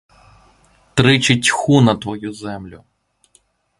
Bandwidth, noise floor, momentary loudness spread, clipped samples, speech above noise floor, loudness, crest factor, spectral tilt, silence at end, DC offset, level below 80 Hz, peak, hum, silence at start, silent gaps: 11.5 kHz; -58 dBFS; 17 LU; under 0.1%; 43 dB; -15 LUFS; 18 dB; -4.5 dB/octave; 1.05 s; under 0.1%; -48 dBFS; 0 dBFS; none; 0.95 s; none